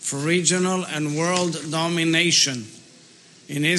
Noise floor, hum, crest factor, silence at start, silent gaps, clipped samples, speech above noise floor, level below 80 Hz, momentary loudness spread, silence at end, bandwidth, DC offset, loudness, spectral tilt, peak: -50 dBFS; none; 18 dB; 0 s; none; under 0.1%; 28 dB; -76 dBFS; 10 LU; 0 s; 12.5 kHz; under 0.1%; -20 LUFS; -3 dB/octave; -4 dBFS